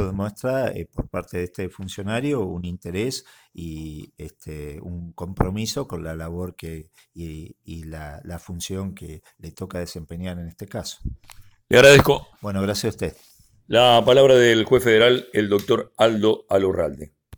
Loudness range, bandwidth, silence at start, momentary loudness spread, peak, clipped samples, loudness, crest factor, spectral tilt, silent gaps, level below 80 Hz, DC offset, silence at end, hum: 17 LU; over 20 kHz; 0 s; 23 LU; -4 dBFS; under 0.1%; -20 LUFS; 18 dB; -5 dB/octave; none; -42 dBFS; under 0.1%; 0 s; none